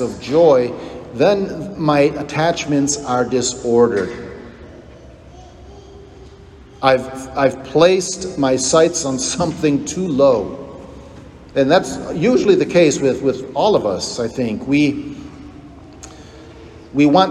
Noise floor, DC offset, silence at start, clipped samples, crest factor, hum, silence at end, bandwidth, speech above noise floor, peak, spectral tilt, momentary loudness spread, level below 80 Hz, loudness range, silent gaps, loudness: -41 dBFS; under 0.1%; 0 s; under 0.1%; 16 dB; none; 0 s; 12 kHz; 25 dB; 0 dBFS; -4.5 dB/octave; 20 LU; -46 dBFS; 7 LU; none; -16 LUFS